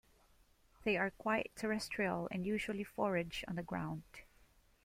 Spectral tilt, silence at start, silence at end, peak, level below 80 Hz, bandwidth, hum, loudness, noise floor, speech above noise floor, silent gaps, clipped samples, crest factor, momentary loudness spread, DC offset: -5.5 dB/octave; 0.8 s; 0.6 s; -22 dBFS; -64 dBFS; 16 kHz; none; -39 LUFS; -69 dBFS; 30 dB; none; under 0.1%; 18 dB; 8 LU; under 0.1%